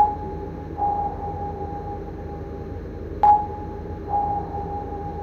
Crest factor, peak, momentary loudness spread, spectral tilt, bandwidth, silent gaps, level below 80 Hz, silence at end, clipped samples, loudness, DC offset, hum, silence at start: 18 dB; -6 dBFS; 15 LU; -9.5 dB/octave; 6.4 kHz; none; -38 dBFS; 0 s; under 0.1%; -26 LUFS; under 0.1%; none; 0 s